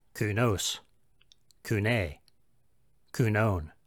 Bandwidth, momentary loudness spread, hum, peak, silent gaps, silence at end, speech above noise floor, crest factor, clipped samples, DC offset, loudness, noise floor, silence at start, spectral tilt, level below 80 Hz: 18 kHz; 13 LU; none; -12 dBFS; none; 0.2 s; 44 dB; 18 dB; under 0.1%; under 0.1%; -29 LUFS; -73 dBFS; 0.15 s; -5 dB/octave; -52 dBFS